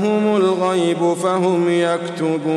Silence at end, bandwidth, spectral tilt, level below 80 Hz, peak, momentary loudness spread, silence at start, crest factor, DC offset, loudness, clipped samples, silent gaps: 0 s; 12 kHz; -6 dB/octave; -68 dBFS; -6 dBFS; 4 LU; 0 s; 10 dB; under 0.1%; -18 LUFS; under 0.1%; none